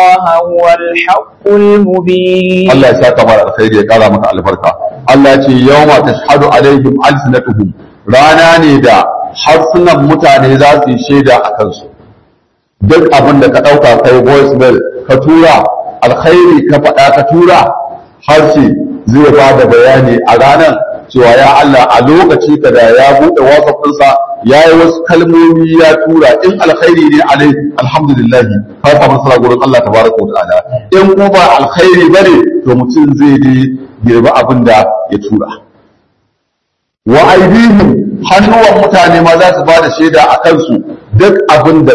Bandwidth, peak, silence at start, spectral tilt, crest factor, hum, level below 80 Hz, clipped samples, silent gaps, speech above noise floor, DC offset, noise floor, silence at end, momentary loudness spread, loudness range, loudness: 12 kHz; 0 dBFS; 0 s; -6.5 dB/octave; 4 dB; none; -36 dBFS; 20%; none; 62 dB; 0.3%; -67 dBFS; 0 s; 7 LU; 3 LU; -5 LUFS